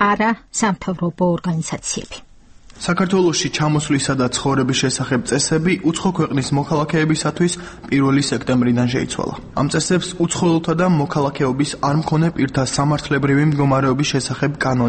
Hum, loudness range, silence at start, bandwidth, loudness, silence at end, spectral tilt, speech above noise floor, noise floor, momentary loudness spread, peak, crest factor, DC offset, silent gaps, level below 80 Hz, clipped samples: none; 2 LU; 0 s; 8.8 kHz; -18 LUFS; 0 s; -5 dB/octave; 25 dB; -43 dBFS; 6 LU; -2 dBFS; 16 dB; under 0.1%; none; -44 dBFS; under 0.1%